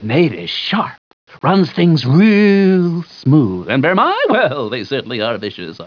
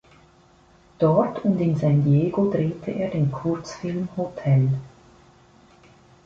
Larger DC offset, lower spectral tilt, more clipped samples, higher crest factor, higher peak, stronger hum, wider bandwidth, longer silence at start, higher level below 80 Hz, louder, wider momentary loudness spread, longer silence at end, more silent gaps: neither; about the same, -8 dB/octave vs -9 dB/octave; neither; second, 12 dB vs 18 dB; first, -2 dBFS vs -6 dBFS; neither; second, 5.4 kHz vs 7.4 kHz; second, 0 s vs 1 s; second, -60 dBFS vs -54 dBFS; first, -14 LUFS vs -23 LUFS; about the same, 10 LU vs 9 LU; second, 0 s vs 1.35 s; first, 0.98-1.27 s vs none